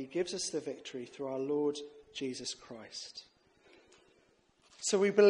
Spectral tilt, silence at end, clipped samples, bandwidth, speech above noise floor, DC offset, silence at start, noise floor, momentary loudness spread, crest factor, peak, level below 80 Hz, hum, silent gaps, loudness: -3.5 dB/octave; 0 s; under 0.1%; 11 kHz; 36 dB; under 0.1%; 0 s; -69 dBFS; 13 LU; 22 dB; -14 dBFS; -78 dBFS; none; none; -37 LUFS